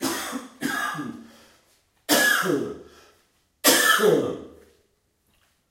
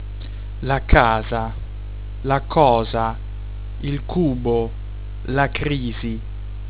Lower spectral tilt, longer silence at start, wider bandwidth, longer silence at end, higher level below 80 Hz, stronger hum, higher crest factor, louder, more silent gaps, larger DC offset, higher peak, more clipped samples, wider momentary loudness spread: second, -2 dB/octave vs -10.5 dB/octave; about the same, 0 s vs 0 s; first, 16 kHz vs 4 kHz; first, 1.2 s vs 0 s; second, -66 dBFS vs -28 dBFS; second, none vs 50 Hz at -30 dBFS; about the same, 22 dB vs 22 dB; about the same, -21 LUFS vs -21 LUFS; neither; second, under 0.1% vs 1%; second, -4 dBFS vs 0 dBFS; neither; about the same, 20 LU vs 18 LU